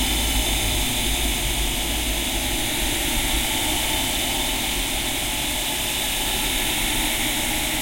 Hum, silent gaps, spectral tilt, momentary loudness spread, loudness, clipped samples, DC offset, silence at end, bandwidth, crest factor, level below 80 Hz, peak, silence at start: none; none; -1.5 dB/octave; 2 LU; -21 LUFS; under 0.1%; under 0.1%; 0 s; 16.5 kHz; 14 dB; -30 dBFS; -8 dBFS; 0 s